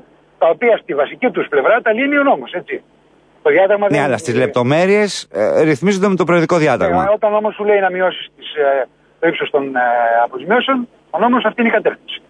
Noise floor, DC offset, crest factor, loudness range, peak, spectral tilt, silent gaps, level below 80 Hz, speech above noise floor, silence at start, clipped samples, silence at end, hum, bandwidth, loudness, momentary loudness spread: -51 dBFS; under 0.1%; 14 dB; 2 LU; -2 dBFS; -5.5 dB/octave; none; -56 dBFS; 36 dB; 0.4 s; under 0.1%; 0.1 s; none; 11 kHz; -15 LUFS; 7 LU